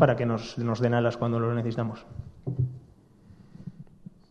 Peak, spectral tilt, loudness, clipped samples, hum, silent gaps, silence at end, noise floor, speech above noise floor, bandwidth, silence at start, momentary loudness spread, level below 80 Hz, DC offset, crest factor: -4 dBFS; -8 dB/octave; -28 LUFS; under 0.1%; none; none; 0.5 s; -55 dBFS; 28 dB; 7.2 kHz; 0 s; 21 LU; -56 dBFS; under 0.1%; 24 dB